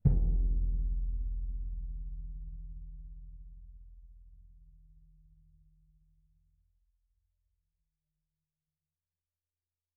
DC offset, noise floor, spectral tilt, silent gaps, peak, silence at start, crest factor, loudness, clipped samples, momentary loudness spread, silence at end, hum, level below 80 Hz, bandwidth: under 0.1%; under -90 dBFS; -14.5 dB/octave; none; -14 dBFS; 0.05 s; 24 dB; -37 LUFS; under 0.1%; 24 LU; 5.3 s; none; -38 dBFS; 0.9 kHz